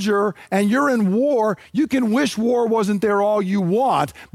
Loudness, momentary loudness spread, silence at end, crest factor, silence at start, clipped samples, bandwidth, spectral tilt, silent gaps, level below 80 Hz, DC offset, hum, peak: -19 LUFS; 4 LU; 0.1 s; 14 dB; 0 s; under 0.1%; 15 kHz; -6 dB/octave; none; -58 dBFS; under 0.1%; none; -4 dBFS